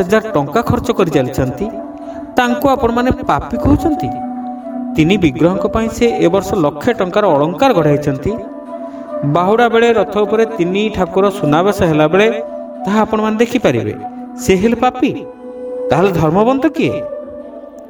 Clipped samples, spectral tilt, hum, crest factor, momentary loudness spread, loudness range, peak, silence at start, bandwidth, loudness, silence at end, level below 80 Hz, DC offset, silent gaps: under 0.1%; -6.5 dB/octave; none; 14 dB; 14 LU; 3 LU; 0 dBFS; 0 s; 19.5 kHz; -14 LUFS; 0 s; -36 dBFS; under 0.1%; none